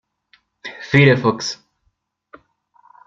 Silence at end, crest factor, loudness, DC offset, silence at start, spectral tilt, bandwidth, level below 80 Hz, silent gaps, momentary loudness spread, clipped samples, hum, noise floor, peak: 1.5 s; 20 dB; -16 LUFS; under 0.1%; 0.65 s; -6 dB/octave; 7.6 kHz; -56 dBFS; none; 22 LU; under 0.1%; none; -68 dBFS; 0 dBFS